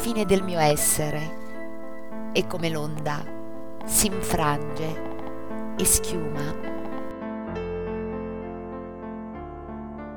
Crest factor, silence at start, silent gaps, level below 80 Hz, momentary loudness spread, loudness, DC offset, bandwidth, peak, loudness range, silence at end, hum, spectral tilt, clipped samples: 20 dB; 0 s; none; -44 dBFS; 17 LU; -27 LUFS; 3%; over 20 kHz; -6 dBFS; 8 LU; 0 s; none; -3.5 dB/octave; under 0.1%